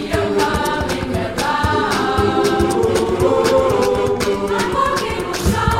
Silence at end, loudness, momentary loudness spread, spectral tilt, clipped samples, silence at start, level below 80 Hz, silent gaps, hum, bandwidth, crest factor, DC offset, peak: 0 s; -17 LUFS; 5 LU; -5 dB/octave; under 0.1%; 0 s; -32 dBFS; none; none; 16.5 kHz; 14 dB; under 0.1%; -2 dBFS